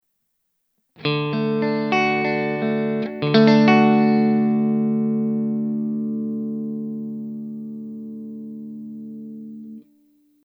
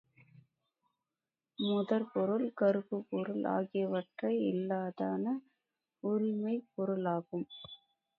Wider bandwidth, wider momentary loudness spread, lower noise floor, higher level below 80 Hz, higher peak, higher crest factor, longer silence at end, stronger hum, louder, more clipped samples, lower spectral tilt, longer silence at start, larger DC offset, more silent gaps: first, 6.4 kHz vs 5 kHz; first, 20 LU vs 10 LU; second, -73 dBFS vs under -90 dBFS; first, -78 dBFS vs -84 dBFS; first, 0 dBFS vs -18 dBFS; about the same, 22 dB vs 18 dB; first, 0.75 s vs 0.4 s; neither; first, -20 LUFS vs -35 LUFS; neither; first, -8 dB/octave vs -6 dB/octave; second, 1 s vs 1.6 s; neither; neither